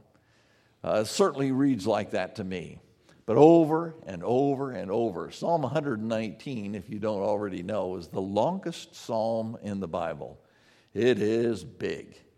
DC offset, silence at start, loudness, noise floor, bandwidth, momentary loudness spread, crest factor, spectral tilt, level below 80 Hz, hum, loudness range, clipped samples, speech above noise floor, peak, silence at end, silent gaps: under 0.1%; 0.85 s; -28 LUFS; -64 dBFS; 14.5 kHz; 12 LU; 24 dB; -6.5 dB/octave; -66 dBFS; none; 6 LU; under 0.1%; 37 dB; -4 dBFS; 0.35 s; none